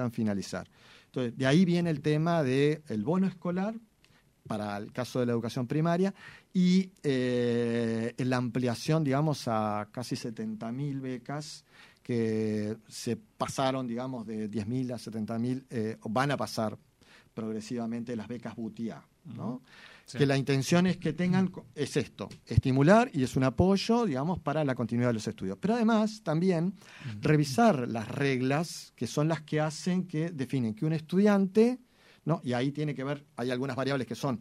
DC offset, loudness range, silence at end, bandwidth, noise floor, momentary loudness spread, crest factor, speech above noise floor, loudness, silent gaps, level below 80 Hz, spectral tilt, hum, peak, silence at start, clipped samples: under 0.1%; 7 LU; 0 s; 14 kHz; -64 dBFS; 13 LU; 22 dB; 35 dB; -30 LUFS; none; -58 dBFS; -6.5 dB/octave; none; -8 dBFS; 0 s; under 0.1%